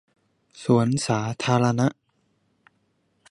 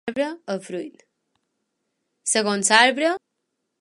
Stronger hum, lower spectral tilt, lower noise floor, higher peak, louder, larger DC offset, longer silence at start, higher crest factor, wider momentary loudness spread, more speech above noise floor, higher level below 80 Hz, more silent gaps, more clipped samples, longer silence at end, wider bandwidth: neither; first, -6 dB/octave vs -1.5 dB/octave; second, -69 dBFS vs -78 dBFS; second, -6 dBFS vs 0 dBFS; second, -23 LUFS vs -20 LUFS; neither; first, 0.55 s vs 0.05 s; about the same, 20 dB vs 24 dB; second, 5 LU vs 18 LU; second, 47 dB vs 56 dB; first, -62 dBFS vs -74 dBFS; neither; neither; first, 1.4 s vs 0.65 s; about the same, 11.5 kHz vs 11.5 kHz